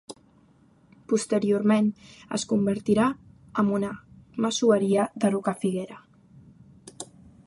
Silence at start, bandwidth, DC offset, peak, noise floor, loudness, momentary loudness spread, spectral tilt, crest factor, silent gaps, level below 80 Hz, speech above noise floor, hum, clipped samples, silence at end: 0.1 s; 11.5 kHz; under 0.1%; -10 dBFS; -59 dBFS; -25 LUFS; 20 LU; -5.5 dB/octave; 18 dB; none; -62 dBFS; 35 dB; none; under 0.1%; 0.4 s